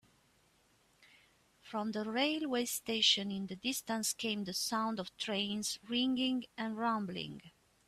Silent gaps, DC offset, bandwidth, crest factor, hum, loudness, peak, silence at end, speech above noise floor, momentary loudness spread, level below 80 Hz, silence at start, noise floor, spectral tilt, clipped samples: none; under 0.1%; 15.5 kHz; 20 dB; none; -35 LUFS; -16 dBFS; 0.4 s; 35 dB; 11 LU; -76 dBFS; 1 s; -71 dBFS; -2.5 dB/octave; under 0.1%